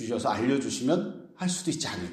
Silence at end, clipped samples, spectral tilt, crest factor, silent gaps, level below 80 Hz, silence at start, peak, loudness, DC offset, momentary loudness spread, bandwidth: 0 s; under 0.1%; -4.5 dB/octave; 16 dB; none; -64 dBFS; 0 s; -12 dBFS; -29 LUFS; under 0.1%; 5 LU; 14.5 kHz